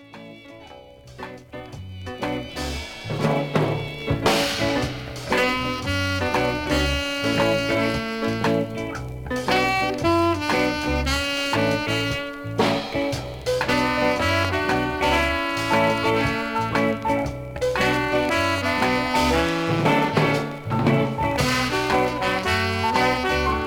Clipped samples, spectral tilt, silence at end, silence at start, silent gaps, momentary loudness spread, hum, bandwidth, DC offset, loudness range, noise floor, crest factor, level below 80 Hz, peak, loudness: under 0.1%; -5 dB/octave; 0 s; 0 s; none; 10 LU; none; 19 kHz; under 0.1%; 3 LU; -44 dBFS; 16 dB; -38 dBFS; -6 dBFS; -22 LUFS